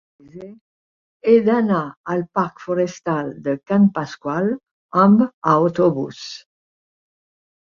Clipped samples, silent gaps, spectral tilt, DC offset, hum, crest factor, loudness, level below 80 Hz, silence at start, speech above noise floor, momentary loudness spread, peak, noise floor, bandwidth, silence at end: under 0.1%; 0.61-1.20 s, 1.97-2.04 s, 4.71-4.89 s, 5.34-5.42 s; -7.5 dB/octave; under 0.1%; none; 18 dB; -19 LUFS; -62 dBFS; 0.35 s; over 72 dB; 17 LU; -2 dBFS; under -90 dBFS; 7.2 kHz; 1.4 s